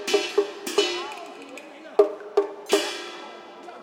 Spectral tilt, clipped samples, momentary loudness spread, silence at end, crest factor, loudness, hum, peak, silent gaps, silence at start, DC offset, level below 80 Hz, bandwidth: -1 dB/octave; under 0.1%; 18 LU; 0 s; 22 dB; -25 LUFS; none; -4 dBFS; none; 0 s; under 0.1%; -82 dBFS; 16.5 kHz